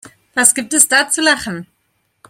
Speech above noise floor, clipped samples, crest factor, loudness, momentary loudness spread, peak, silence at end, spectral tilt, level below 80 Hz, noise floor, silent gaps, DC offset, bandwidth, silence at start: 51 dB; 0.1%; 16 dB; -12 LUFS; 14 LU; 0 dBFS; 0.65 s; -0.5 dB/octave; -56 dBFS; -65 dBFS; none; under 0.1%; over 20 kHz; 0.05 s